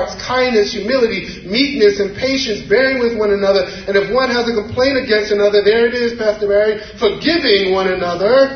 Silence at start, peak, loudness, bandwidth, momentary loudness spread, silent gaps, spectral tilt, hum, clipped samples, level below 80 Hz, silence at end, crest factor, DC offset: 0 s; 0 dBFS; -15 LUFS; 6.6 kHz; 6 LU; none; -4.5 dB/octave; none; under 0.1%; -42 dBFS; 0 s; 14 dB; under 0.1%